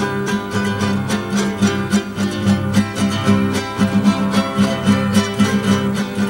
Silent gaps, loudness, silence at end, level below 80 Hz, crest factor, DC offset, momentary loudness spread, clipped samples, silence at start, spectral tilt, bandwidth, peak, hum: none; -17 LUFS; 0 s; -46 dBFS; 16 dB; under 0.1%; 4 LU; under 0.1%; 0 s; -5.5 dB/octave; 16.5 kHz; 0 dBFS; none